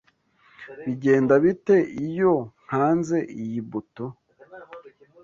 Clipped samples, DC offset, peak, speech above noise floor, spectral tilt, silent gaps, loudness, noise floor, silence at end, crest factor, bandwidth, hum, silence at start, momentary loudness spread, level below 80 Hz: under 0.1%; under 0.1%; -6 dBFS; 39 dB; -8 dB/octave; none; -23 LUFS; -61 dBFS; 0.45 s; 18 dB; 7.6 kHz; none; 0.6 s; 18 LU; -64 dBFS